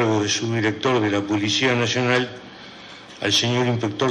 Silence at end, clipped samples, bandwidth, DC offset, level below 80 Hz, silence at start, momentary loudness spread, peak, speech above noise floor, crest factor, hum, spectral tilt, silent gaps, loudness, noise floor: 0 s; under 0.1%; 11.5 kHz; under 0.1%; -62 dBFS; 0 s; 20 LU; -6 dBFS; 20 dB; 14 dB; none; -4 dB/octave; none; -21 LUFS; -41 dBFS